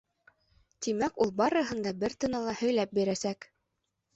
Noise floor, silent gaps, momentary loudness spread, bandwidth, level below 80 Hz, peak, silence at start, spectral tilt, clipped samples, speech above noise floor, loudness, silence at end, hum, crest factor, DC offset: -82 dBFS; none; 7 LU; 8.2 kHz; -64 dBFS; -14 dBFS; 0.8 s; -4.5 dB/octave; under 0.1%; 52 dB; -30 LUFS; 0.7 s; none; 18 dB; under 0.1%